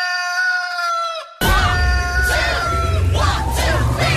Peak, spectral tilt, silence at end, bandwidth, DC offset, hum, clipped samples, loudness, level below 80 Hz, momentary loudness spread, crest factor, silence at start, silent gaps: -6 dBFS; -4 dB/octave; 0 s; 14.5 kHz; under 0.1%; none; under 0.1%; -18 LUFS; -22 dBFS; 4 LU; 10 dB; 0 s; none